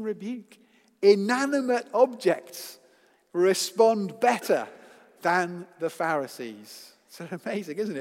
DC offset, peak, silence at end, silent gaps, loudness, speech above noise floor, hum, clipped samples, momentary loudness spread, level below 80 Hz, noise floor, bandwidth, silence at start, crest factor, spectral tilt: under 0.1%; -6 dBFS; 0 s; none; -25 LUFS; 36 dB; none; under 0.1%; 18 LU; -86 dBFS; -62 dBFS; 16 kHz; 0 s; 20 dB; -4.5 dB/octave